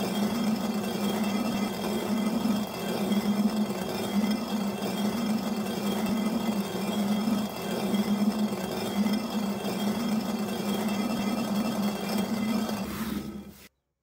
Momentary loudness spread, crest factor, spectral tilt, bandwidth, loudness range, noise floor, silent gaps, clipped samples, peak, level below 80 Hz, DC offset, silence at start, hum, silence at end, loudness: 4 LU; 14 dB; -5.5 dB/octave; 16 kHz; 1 LU; -55 dBFS; none; under 0.1%; -14 dBFS; -58 dBFS; under 0.1%; 0 s; none; 0.35 s; -29 LUFS